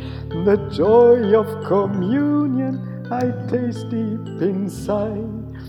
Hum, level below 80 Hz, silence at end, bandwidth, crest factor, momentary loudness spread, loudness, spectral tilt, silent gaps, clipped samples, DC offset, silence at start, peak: none; -44 dBFS; 0 s; 12.5 kHz; 16 dB; 13 LU; -19 LUFS; -8.5 dB/octave; none; under 0.1%; under 0.1%; 0 s; -4 dBFS